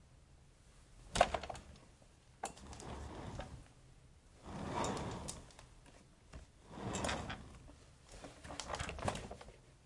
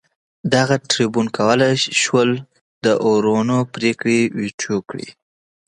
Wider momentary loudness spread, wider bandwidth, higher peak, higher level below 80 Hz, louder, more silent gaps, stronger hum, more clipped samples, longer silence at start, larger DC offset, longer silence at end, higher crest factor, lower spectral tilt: first, 24 LU vs 9 LU; about the same, 11.5 kHz vs 11 kHz; second, -12 dBFS vs 0 dBFS; about the same, -56 dBFS vs -60 dBFS; second, -43 LUFS vs -18 LUFS; second, none vs 2.61-2.81 s, 4.54-4.58 s; neither; neither; second, 0 s vs 0.45 s; neither; second, 0 s vs 0.55 s; first, 32 dB vs 18 dB; about the same, -4 dB/octave vs -4.5 dB/octave